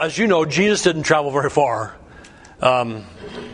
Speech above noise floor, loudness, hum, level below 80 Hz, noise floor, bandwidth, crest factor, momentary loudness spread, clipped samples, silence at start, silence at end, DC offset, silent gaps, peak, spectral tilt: 25 dB; -18 LUFS; none; -50 dBFS; -43 dBFS; 10.5 kHz; 20 dB; 16 LU; under 0.1%; 0 s; 0 s; under 0.1%; none; 0 dBFS; -4.5 dB/octave